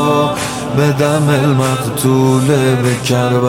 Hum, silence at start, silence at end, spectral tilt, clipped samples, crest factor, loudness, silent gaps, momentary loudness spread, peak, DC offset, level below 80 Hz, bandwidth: none; 0 s; 0 s; -6 dB/octave; under 0.1%; 12 dB; -13 LUFS; none; 4 LU; 0 dBFS; under 0.1%; -44 dBFS; 16.5 kHz